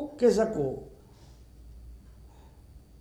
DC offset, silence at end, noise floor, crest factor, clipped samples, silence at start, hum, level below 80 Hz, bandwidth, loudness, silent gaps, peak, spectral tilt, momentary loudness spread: under 0.1%; 0.2 s; -52 dBFS; 20 dB; under 0.1%; 0 s; none; -52 dBFS; 13.5 kHz; -27 LUFS; none; -12 dBFS; -6.5 dB/octave; 27 LU